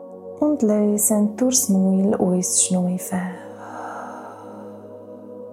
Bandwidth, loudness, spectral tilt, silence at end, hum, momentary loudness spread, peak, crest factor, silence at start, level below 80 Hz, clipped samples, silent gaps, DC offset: 16 kHz; -19 LUFS; -5 dB/octave; 0 s; none; 21 LU; -4 dBFS; 18 dB; 0 s; -70 dBFS; under 0.1%; none; under 0.1%